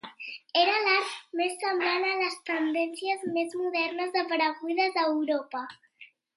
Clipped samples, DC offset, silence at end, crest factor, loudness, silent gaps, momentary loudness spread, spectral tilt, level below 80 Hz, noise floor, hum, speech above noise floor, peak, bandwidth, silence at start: under 0.1%; under 0.1%; 0.3 s; 18 dB; -28 LUFS; none; 8 LU; -2.5 dB/octave; -84 dBFS; -56 dBFS; none; 28 dB; -10 dBFS; 11.5 kHz; 0.05 s